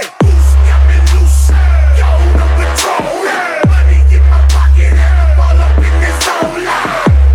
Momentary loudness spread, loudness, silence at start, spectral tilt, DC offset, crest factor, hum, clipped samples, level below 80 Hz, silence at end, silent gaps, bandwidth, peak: 6 LU; -10 LUFS; 0 s; -5.5 dB/octave; under 0.1%; 6 dB; none; under 0.1%; -8 dBFS; 0 s; none; 12.5 kHz; 0 dBFS